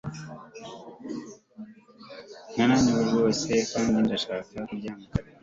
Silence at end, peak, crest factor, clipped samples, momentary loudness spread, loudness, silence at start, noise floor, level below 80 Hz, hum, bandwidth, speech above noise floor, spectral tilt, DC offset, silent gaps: 0.2 s; -10 dBFS; 18 dB; under 0.1%; 23 LU; -26 LUFS; 0.05 s; -48 dBFS; -52 dBFS; none; 7.8 kHz; 23 dB; -5 dB/octave; under 0.1%; none